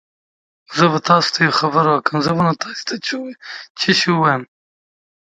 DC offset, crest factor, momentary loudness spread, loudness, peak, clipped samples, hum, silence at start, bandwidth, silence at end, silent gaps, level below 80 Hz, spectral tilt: under 0.1%; 18 dB; 12 LU; -16 LUFS; 0 dBFS; under 0.1%; none; 0.7 s; 9.2 kHz; 0.9 s; 3.70-3.75 s; -60 dBFS; -4.5 dB/octave